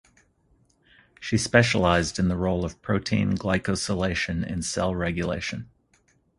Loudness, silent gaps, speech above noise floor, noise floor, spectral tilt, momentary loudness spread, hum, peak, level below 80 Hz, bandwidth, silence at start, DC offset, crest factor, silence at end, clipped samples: -25 LUFS; none; 40 dB; -65 dBFS; -5 dB/octave; 9 LU; none; 0 dBFS; -42 dBFS; 11.5 kHz; 1.2 s; under 0.1%; 26 dB; 0.75 s; under 0.1%